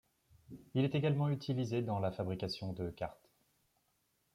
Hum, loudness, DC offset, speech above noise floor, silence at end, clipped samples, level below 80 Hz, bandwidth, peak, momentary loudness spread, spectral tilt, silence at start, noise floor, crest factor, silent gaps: none; -37 LUFS; under 0.1%; 42 dB; 1.2 s; under 0.1%; -66 dBFS; 12 kHz; -22 dBFS; 12 LU; -7.5 dB/octave; 0.5 s; -79 dBFS; 16 dB; none